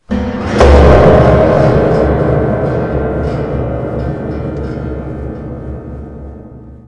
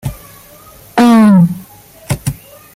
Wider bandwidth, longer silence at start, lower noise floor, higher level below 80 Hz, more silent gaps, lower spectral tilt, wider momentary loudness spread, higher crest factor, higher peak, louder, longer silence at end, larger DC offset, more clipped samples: second, 9.2 kHz vs 16 kHz; about the same, 0.1 s vs 0.05 s; second, -32 dBFS vs -39 dBFS; first, -20 dBFS vs -38 dBFS; neither; about the same, -8 dB/octave vs -7 dB/octave; about the same, 20 LU vs 20 LU; about the same, 12 dB vs 12 dB; about the same, 0 dBFS vs -2 dBFS; about the same, -11 LUFS vs -11 LUFS; second, 0.05 s vs 0.4 s; neither; first, 0.3% vs under 0.1%